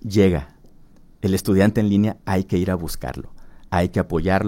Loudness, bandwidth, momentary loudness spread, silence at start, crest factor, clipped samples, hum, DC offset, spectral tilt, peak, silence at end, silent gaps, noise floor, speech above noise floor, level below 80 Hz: -21 LUFS; 16.5 kHz; 11 LU; 0.05 s; 18 dB; under 0.1%; none; under 0.1%; -7 dB/octave; -4 dBFS; 0 s; none; -47 dBFS; 27 dB; -38 dBFS